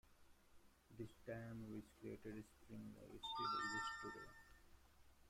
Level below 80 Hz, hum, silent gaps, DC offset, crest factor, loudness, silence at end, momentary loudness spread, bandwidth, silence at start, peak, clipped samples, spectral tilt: -72 dBFS; none; none; under 0.1%; 18 dB; -51 LUFS; 0 s; 16 LU; 16 kHz; 0.05 s; -34 dBFS; under 0.1%; -4 dB/octave